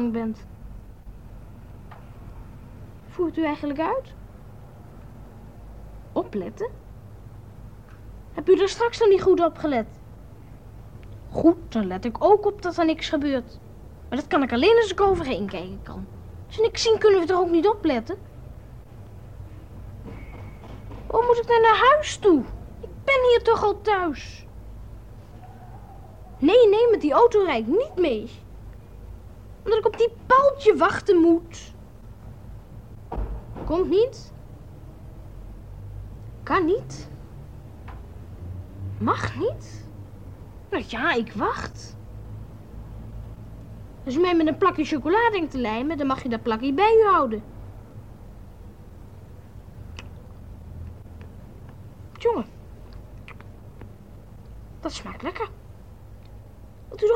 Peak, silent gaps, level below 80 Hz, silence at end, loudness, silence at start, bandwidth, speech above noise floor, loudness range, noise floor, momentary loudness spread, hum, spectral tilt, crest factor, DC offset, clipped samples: -4 dBFS; none; -44 dBFS; 0 s; -22 LUFS; 0 s; 9.8 kHz; 24 dB; 15 LU; -45 dBFS; 26 LU; none; -5.5 dB/octave; 20 dB; 0.3%; under 0.1%